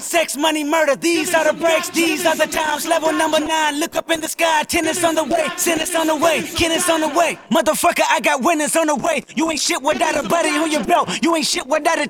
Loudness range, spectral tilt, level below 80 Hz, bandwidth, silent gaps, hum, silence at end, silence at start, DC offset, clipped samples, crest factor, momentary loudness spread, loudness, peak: 1 LU; -2 dB/octave; -50 dBFS; 19 kHz; none; none; 0 s; 0 s; under 0.1%; under 0.1%; 14 dB; 3 LU; -17 LUFS; -4 dBFS